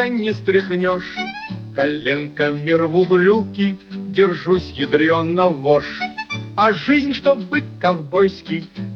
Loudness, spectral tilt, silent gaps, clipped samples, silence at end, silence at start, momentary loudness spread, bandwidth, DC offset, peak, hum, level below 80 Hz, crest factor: -18 LUFS; -7.5 dB/octave; none; under 0.1%; 0 s; 0 s; 11 LU; 6.6 kHz; under 0.1%; -2 dBFS; none; -54 dBFS; 16 dB